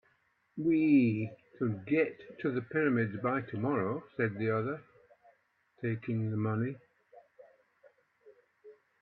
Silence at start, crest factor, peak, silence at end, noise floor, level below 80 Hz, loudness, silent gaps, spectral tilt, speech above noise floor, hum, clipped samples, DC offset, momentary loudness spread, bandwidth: 0.55 s; 18 dB; -16 dBFS; 0.3 s; -73 dBFS; -74 dBFS; -32 LUFS; none; -11 dB/octave; 42 dB; none; under 0.1%; under 0.1%; 12 LU; 4.6 kHz